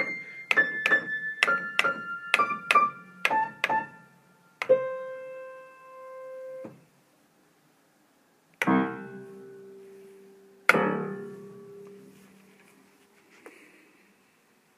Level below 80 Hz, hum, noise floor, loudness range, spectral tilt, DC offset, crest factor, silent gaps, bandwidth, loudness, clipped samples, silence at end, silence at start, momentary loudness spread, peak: -82 dBFS; none; -64 dBFS; 16 LU; -4 dB/octave; under 0.1%; 28 dB; none; 15.5 kHz; -26 LUFS; under 0.1%; 1.25 s; 0 s; 24 LU; -2 dBFS